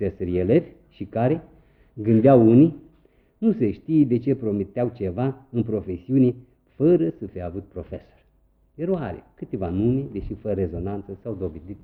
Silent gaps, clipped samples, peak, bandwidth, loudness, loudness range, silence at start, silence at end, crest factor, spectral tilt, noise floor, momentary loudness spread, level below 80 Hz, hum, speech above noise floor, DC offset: none; under 0.1%; -4 dBFS; 4.3 kHz; -22 LUFS; 8 LU; 0 s; 0.05 s; 20 dB; -11.5 dB/octave; -61 dBFS; 17 LU; -50 dBFS; none; 39 dB; under 0.1%